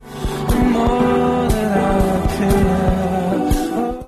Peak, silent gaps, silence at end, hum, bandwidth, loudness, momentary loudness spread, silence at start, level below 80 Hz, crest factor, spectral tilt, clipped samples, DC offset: -4 dBFS; none; 0 s; none; 13.5 kHz; -17 LUFS; 4 LU; 0 s; -24 dBFS; 12 dB; -6.5 dB/octave; under 0.1%; under 0.1%